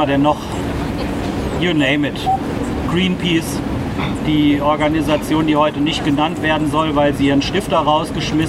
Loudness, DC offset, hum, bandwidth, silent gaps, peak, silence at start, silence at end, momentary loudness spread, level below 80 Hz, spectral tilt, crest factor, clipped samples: -17 LUFS; under 0.1%; none; 14.5 kHz; none; -2 dBFS; 0 s; 0 s; 7 LU; -32 dBFS; -6 dB/octave; 14 dB; under 0.1%